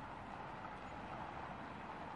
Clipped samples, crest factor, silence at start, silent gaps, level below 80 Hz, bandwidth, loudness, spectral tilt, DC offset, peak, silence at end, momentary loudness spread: under 0.1%; 16 dB; 0 s; none; -64 dBFS; 11 kHz; -49 LUFS; -6 dB/octave; under 0.1%; -34 dBFS; 0 s; 2 LU